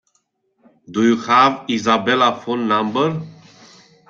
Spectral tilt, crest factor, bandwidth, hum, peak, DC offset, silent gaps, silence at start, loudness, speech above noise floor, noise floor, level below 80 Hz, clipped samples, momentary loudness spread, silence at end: -5 dB/octave; 18 dB; 7.4 kHz; none; -2 dBFS; under 0.1%; none; 0.9 s; -17 LUFS; 50 dB; -67 dBFS; -62 dBFS; under 0.1%; 11 LU; 0.75 s